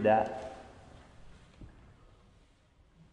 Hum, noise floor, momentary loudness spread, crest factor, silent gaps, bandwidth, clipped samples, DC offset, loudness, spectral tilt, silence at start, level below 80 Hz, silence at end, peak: none; -64 dBFS; 29 LU; 24 dB; none; 10.5 kHz; under 0.1%; under 0.1%; -32 LUFS; -7 dB/octave; 0 s; -60 dBFS; 1.45 s; -14 dBFS